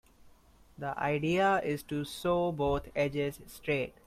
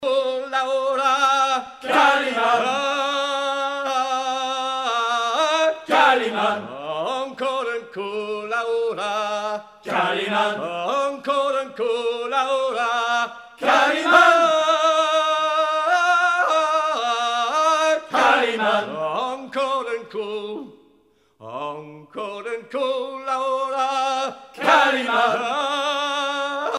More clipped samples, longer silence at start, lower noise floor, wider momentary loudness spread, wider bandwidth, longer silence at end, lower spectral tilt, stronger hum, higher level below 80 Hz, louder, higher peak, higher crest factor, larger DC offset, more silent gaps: neither; first, 0.2 s vs 0 s; about the same, -60 dBFS vs -60 dBFS; second, 9 LU vs 12 LU; first, 16 kHz vs 14 kHz; first, 0.15 s vs 0 s; first, -6 dB/octave vs -2 dB/octave; neither; first, -54 dBFS vs -70 dBFS; second, -32 LUFS vs -20 LUFS; second, -16 dBFS vs -2 dBFS; about the same, 16 dB vs 20 dB; neither; neither